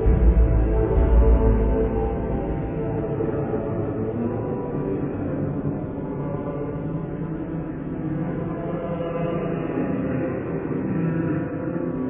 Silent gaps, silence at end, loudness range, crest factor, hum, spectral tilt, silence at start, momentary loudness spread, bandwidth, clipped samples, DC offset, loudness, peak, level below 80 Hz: none; 0 s; 6 LU; 16 dB; none; -13 dB/octave; 0 s; 10 LU; 3.3 kHz; under 0.1%; under 0.1%; -25 LUFS; -6 dBFS; -26 dBFS